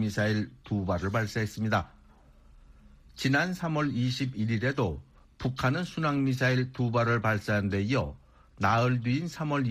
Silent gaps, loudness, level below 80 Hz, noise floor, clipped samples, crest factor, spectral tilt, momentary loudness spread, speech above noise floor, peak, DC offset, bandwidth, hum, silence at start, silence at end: none; -29 LUFS; -52 dBFS; -56 dBFS; under 0.1%; 16 dB; -6.5 dB/octave; 7 LU; 28 dB; -12 dBFS; under 0.1%; 14.5 kHz; none; 0 s; 0 s